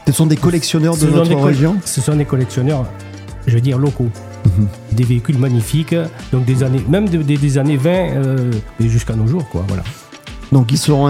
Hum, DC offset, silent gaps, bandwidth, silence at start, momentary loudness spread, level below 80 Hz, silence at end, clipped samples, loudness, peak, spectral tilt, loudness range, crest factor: none; under 0.1%; none; 15.5 kHz; 0 s; 9 LU; -34 dBFS; 0 s; under 0.1%; -15 LUFS; 0 dBFS; -6.5 dB/octave; 2 LU; 14 dB